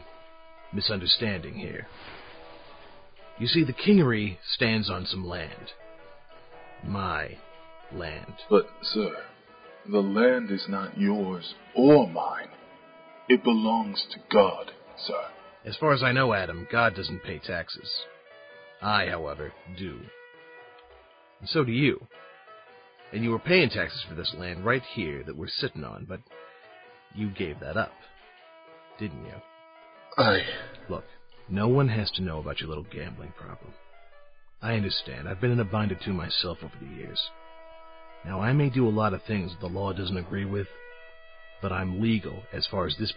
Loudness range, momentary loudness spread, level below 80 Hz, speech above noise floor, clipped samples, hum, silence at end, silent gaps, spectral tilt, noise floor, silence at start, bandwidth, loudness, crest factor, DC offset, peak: 9 LU; 21 LU; -52 dBFS; 28 dB; under 0.1%; none; 0 s; none; -10 dB/octave; -55 dBFS; 0 s; 5.2 kHz; -27 LUFS; 22 dB; under 0.1%; -6 dBFS